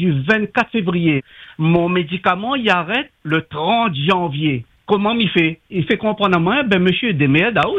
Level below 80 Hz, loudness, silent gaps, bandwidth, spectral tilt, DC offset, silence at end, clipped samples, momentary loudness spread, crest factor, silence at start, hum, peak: -50 dBFS; -17 LUFS; none; 7.6 kHz; -7.5 dB/octave; under 0.1%; 0 s; under 0.1%; 6 LU; 16 dB; 0 s; none; -2 dBFS